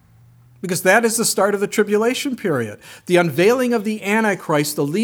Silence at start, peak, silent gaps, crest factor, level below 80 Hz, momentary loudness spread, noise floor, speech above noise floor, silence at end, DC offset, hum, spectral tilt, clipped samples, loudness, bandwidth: 0.65 s; -2 dBFS; none; 18 dB; -66 dBFS; 9 LU; -49 dBFS; 31 dB; 0 s; under 0.1%; none; -4 dB/octave; under 0.1%; -18 LUFS; over 20 kHz